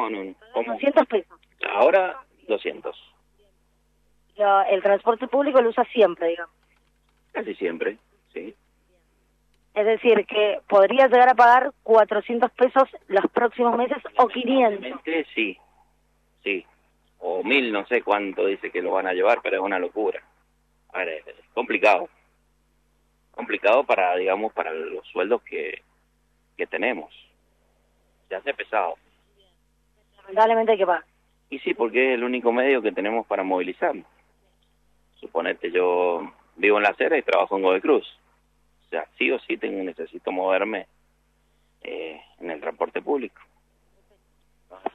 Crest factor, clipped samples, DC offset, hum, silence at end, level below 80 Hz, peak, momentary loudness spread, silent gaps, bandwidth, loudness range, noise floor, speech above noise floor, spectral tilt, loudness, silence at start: 20 dB; under 0.1%; under 0.1%; none; 0.05 s; -68 dBFS; -4 dBFS; 15 LU; none; 7.4 kHz; 11 LU; -66 dBFS; 44 dB; -5.5 dB/octave; -22 LUFS; 0 s